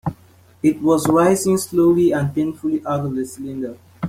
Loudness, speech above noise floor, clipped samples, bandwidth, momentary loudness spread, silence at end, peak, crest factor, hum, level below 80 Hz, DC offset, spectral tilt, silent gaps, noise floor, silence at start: -18 LUFS; 32 dB; under 0.1%; 16 kHz; 13 LU; 0 s; -2 dBFS; 16 dB; none; -52 dBFS; under 0.1%; -6.5 dB/octave; none; -49 dBFS; 0.05 s